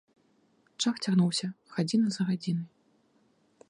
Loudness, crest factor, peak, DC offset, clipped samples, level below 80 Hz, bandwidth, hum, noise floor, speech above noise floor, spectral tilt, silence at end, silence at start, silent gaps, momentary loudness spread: -29 LUFS; 16 dB; -14 dBFS; under 0.1%; under 0.1%; -78 dBFS; 11 kHz; none; -68 dBFS; 39 dB; -5.5 dB/octave; 1.05 s; 0.8 s; none; 9 LU